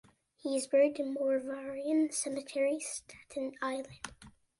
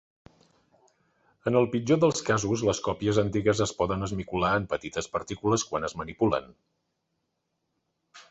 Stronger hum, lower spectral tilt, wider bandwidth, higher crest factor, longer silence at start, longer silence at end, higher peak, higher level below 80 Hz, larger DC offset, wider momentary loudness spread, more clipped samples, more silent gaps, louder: neither; second, -3 dB/octave vs -5 dB/octave; first, 11.5 kHz vs 8.4 kHz; about the same, 16 dB vs 20 dB; second, 0.45 s vs 1.45 s; first, 0.3 s vs 0.1 s; second, -18 dBFS vs -8 dBFS; second, -72 dBFS vs -52 dBFS; neither; first, 15 LU vs 8 LU; neither; neither; second, -33 LUFS vs -27 LUFS